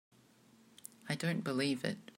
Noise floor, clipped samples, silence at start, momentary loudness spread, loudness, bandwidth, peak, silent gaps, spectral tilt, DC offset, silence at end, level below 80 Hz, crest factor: -65 dBFS; under 0.1%; 1.05 s; 19 LU; -36 LUFS; 16 kHz; -20 dBFS; none; -5 dB/octave; under 0.1%; 0.15 s; -82 dBFS; 20 dB